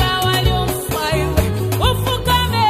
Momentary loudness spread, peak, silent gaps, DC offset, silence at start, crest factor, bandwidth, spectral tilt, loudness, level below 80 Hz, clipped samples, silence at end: 4 LU; -2 dBFS; none; under 0.1%; 0 s; 16 dB; 15.5 kHz; -4.5 dB/octave; -17 LUFS; -26 dBFS; under 0.1%; 0 s